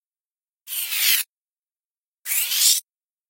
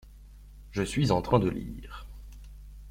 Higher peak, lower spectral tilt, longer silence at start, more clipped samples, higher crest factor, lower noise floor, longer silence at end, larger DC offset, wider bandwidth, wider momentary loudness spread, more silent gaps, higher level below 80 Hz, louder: first, -4 dBFS vs -10 dBFS; second, 7 dB/octave vs -6.5 dB/octave; first, 0.65 s vs 0.05 s; neither; about the same, 22 dB vs 22 dB; first, under -90 dBFS vs -49 dBFS; first, 0.5 s vs 0 s; neither; about the same, 16.5 kHz vs 16 kHz; second, 15 LU vs 25 LU; first, 1.29-1.42 s, 1.52-1.63 s, 1.85-1.95 s, 2.03-2.22 s vs none; second, -86 dBFS vs -44 dBFS; first, -19 LUFS vs -28 LUFS